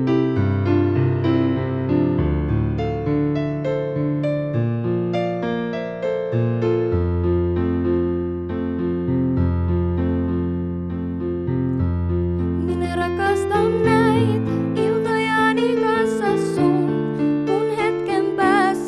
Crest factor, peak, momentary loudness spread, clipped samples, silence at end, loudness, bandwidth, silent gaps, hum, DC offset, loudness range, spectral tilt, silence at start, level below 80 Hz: 16 dB; -4 dBFS; 6 LU; under 0.1%; 0 s; -21 LUFS; 12 kHz; none; none; under 0.1%; 4 LU; -8 dB/octave; 0 s; -36 dBFS